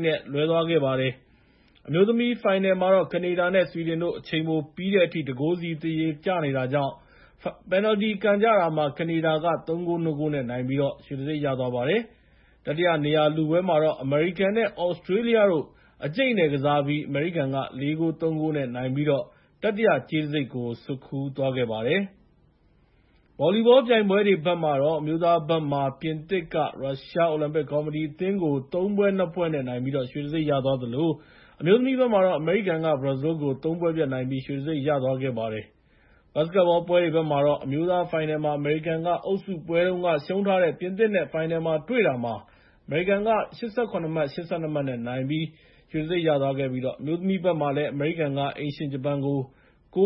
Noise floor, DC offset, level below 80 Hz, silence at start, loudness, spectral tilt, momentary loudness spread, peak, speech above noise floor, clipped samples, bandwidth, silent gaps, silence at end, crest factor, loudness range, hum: -61 dBFS; under 0.1%; -60 dBFS; 0 s; -25 LUFS; -11 dB/octave; 8 LU; -6 dBFS; 37 dB; under 0.1%; 5.8 kHz; none; 0 s; 18 dB; 4 LU; none